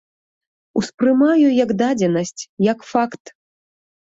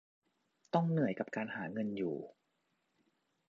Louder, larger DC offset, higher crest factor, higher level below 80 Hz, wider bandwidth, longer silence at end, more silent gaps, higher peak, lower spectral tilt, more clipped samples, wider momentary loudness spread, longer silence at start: first, -18 LUFS vs -37 LUFS; neither; second, 16 dB vs 22 dB; first, -60 dBFS vs -80 dBFS; first, 8 kHz vs 7.2 kHz; second, 0.95 s vs 1.2 s; first, 0.94-0.98 s, 2.49-2.57 s vs none; first, -4 dBFS vs -16 dBFS; about the same, -6 dB/octave vs -7 dB/octave; neither; first, 11 LU vs 8 LU; about the same, 0.75 s vs 0.75 s